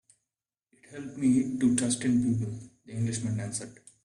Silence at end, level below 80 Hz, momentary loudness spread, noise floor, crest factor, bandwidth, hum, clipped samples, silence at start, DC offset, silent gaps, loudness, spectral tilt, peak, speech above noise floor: 0.3 s; -62 dBFS; 17 LU; -90 dBFS; 20 dB; 11.5 kHz; none; under 0.1%; 0.9 s; under 0.1%; none; -28 LUFS; -5.5 dB/octave; -10 dBFS; 62 dB